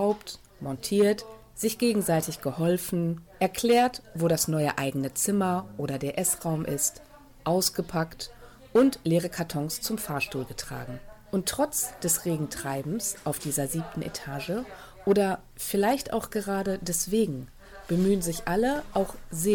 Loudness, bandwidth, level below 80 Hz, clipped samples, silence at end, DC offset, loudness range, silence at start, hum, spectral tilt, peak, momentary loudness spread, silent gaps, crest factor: -28 LUFS; 19 kHz; -52 dBFS; under 0.1%; 0 s; under 0.1%; 3 LU; 0 s; none; -4.5 dB/octave; -12 dBFS; 11 LU; none; 16 dB